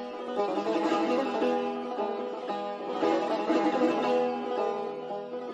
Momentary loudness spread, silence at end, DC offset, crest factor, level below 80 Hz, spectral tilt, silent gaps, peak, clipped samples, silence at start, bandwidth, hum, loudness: 8 LU; 0 s; under 0.1%; 16 dB; -76 dBFS; -5.5 dB/octave; none; -14 dBFS; under 0.1%; 0 s; 8.8 kHz; none; -29 LUFS